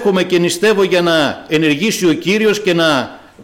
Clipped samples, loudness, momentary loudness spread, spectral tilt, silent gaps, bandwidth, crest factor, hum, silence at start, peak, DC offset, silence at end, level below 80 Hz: under 0.1%; -13 LUFS; 3 LU; -4.5 dB/octave; none; 17 kHz; 10 dB; none; 0 s; -4 dBFS; under 0.1%; 0 s; -52 dBFS